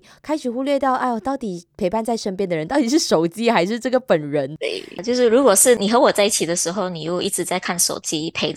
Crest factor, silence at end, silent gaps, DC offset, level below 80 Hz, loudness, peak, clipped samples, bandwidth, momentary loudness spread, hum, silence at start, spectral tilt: 20 dB; 0 s; none; under 0.1%; -58 dBFS; -19 LUFS; 0 dBFS; under 0.1%; 15 kHz; 11 LU; none; 0.25 s; -3 dB/octave